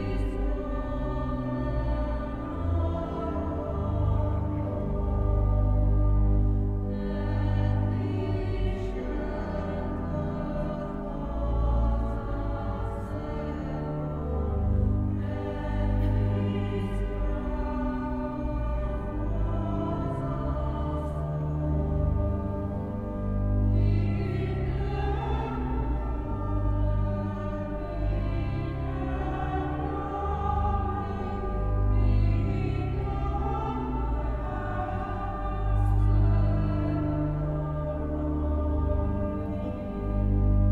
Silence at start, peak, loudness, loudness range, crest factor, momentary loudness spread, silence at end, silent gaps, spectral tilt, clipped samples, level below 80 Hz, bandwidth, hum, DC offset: 0 s; -14 dBFS; -29 LUFS; 4 LU; 14 dB; 7 LU; 0 s; none; -10 dB/octave; under 0.1%; -30 dBFS; 4.7 kHz; none; under 0.1%